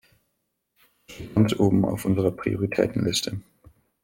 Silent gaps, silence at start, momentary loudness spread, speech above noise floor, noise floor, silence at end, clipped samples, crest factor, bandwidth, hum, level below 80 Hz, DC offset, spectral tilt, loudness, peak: none; 1.1 s; 10 LU; 53 dB; -77 dBFS; 0.65 s; under 0.1%; 20 dB; 17 kHz; none; -52 dBFS; under 0.1%; -6 dB/octave; -24 LUFS; -6 dBFS